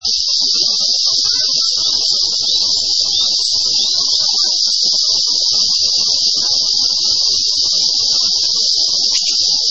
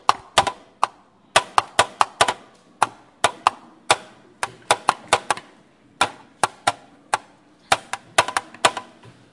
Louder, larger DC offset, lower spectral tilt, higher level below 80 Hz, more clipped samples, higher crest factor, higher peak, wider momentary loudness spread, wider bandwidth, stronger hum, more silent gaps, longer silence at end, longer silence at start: first, -11 LUFS vs -22 LUFS; first, 1% vs under 0.1%; second, 2 dB/octave vs -1 dB/octave; first, -52 dBFS vs -58 dBFS; neither; second, 14 dB vs 24 dB; about the same, 0 dBFS vs 0 dBFS; second, 1 LU vs 8 LU; second, 8.6 kHz vs 11.5 kHz; neither; neither; second, 0 s vs 0.5 s; about the same, 0 s vs 0.1 s